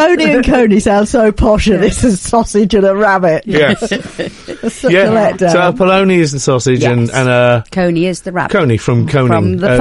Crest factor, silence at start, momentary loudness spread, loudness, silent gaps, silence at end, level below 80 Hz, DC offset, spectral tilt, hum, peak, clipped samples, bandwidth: 10 dB; 0 s; 7 LU; -11 LUFS; none; 0 s; -28 dBFS; under 0.1%; -5.5 dB/octave; none; 0 dBFS; under 0.1%; 11.5 kHz